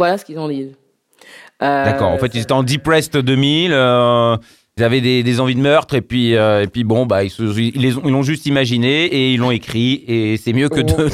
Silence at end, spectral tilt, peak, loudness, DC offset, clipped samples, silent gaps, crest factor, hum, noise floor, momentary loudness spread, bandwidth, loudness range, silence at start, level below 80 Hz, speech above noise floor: 0 s; -6 dB/octave; -2 dBFS; -15 LUFS; under 0.1%; under 0.1%; none; 14 dB; none; -48 dBFS; 6 LU; 14.5 kHz; 2 LU; 0 s; -44 dBFS; 34 dB